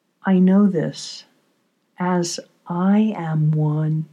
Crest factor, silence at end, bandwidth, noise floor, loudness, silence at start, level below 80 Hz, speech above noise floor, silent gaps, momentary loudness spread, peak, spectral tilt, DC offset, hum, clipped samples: 14 dB; 0.05 s; 10.5 kHz; -66 dBFS; -19 LUFS; 0.25 s; -82 dBFS; 48 dB; none; 15 LU; -6 dBFS; -7 dB/octave; under 0.1%; none; under 0.1%